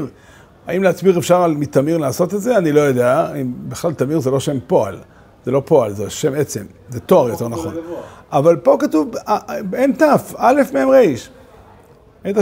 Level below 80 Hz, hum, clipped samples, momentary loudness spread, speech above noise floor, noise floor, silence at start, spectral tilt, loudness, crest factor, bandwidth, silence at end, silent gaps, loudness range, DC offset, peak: -52 dBFS; none; under 0.1%; 14 LU; 30 dB; -46 dBFS; 0 s; -6.5 dB/octave; -16 LUFS; 16 dB; 16.5 kHz; 0 s; none; 4 LU; under 0.1%; 0 dBFS